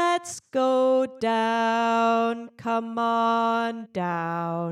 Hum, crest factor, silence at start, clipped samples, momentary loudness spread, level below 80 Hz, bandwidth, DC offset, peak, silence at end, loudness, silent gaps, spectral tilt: none; 12 dB; 0 s; under 0.1%; 7 LU; -74 dBFS; 13.5 kHz; under 0.1%; -12 dBFS; 0 s; -24 LUFS; none; -5 dB/octave